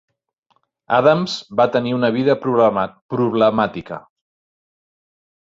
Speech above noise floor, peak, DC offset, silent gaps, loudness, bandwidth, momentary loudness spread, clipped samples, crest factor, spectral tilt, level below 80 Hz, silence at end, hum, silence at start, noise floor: 48 dB; -2 dBFS; under 0.1%; 3.01-3.09 s; -17 LUFS; 7.8 kHz; 9 LU; under 0.1%; 18 dB; -6.5 dB/octave; -58 dBFS; 1.6 s; none; 0.9 s; -65 dBFS